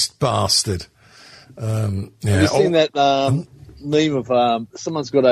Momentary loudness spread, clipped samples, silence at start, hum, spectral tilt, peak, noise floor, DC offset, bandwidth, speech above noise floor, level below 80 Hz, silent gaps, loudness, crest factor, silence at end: 12 LU; under 0.1%; 0 s; none; -5 dB/octave; -2 dBFS; -46 dBFS; under 0.1%; 14.5 kHz; 27 dB; -50 dBFS; none; -19 LUFS; 18 dB; 0 s